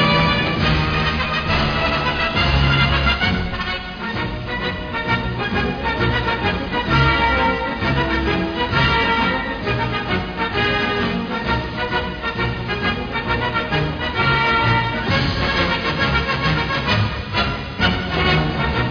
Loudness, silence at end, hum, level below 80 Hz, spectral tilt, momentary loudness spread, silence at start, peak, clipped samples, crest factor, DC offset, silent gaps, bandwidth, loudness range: -19 LUFS; 0 s; none; -30 dBFS; -6.5 dB/octave; 7 LU; 0 s; -4 dBFS; under 0.1%; 14 dB; under 0.1%; none; 5.4 kHz; 3 LU